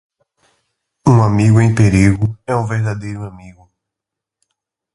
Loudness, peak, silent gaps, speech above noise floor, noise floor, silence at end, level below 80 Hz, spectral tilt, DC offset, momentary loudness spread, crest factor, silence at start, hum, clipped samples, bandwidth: -14 LUFS; 0 dBFS; none; 70 dB; -83 dBFS; 1.45 s; -36 dBFS; -7.5 dB/octave; under 0.1%; 15 LU; 16 dB; 1.05 s; none; under 0.1%; 11.5 kHz